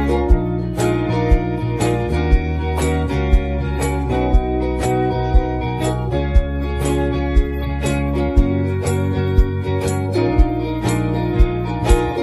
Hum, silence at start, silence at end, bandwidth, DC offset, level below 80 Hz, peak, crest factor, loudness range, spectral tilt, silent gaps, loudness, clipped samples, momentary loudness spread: none; 0 s; 0 s; 13 kHz; under 0.1%; -20 dBFS; 0 dBFS; 16 dB; 1 LU; -7 dB/octave; none; -19 LUFS; under 0.1%; 3 LU